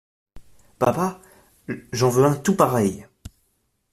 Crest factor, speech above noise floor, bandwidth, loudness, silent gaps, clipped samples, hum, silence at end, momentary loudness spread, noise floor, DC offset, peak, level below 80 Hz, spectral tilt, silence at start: 20 dB; 49 dB; 15 kHz; -21 LUFS; none; under 0.1%; none; 0.65 s; 16 LU; -69 dBFS; under 0.1%; -2 dBFS; -54 dBFS; -6 dB/octave; 0.35 s